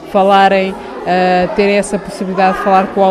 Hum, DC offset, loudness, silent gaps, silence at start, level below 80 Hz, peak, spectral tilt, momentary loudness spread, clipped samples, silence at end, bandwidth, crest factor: none; under 0.1%; -12 LUFS; none; 0 s; -42 dBFS; 0 dBFS; -5.5 dB/octave; 11 LU; under 0.1%; 0 s; 13 kHz; 12 dB